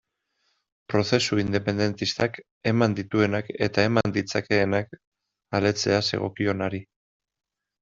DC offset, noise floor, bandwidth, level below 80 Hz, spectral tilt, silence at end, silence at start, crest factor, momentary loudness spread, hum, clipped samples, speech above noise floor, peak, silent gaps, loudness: under 0.1%; -74 dBFS; 8 kHz; -58 dBFS; -5.5 dB/octave; 1 s; 0.9 s; 22 dB; 6 LU; none; under 0.1%; 49 dB; -4 dBFS; 2.51-2.61 s, 5.07-5.12 s; -25 LUFS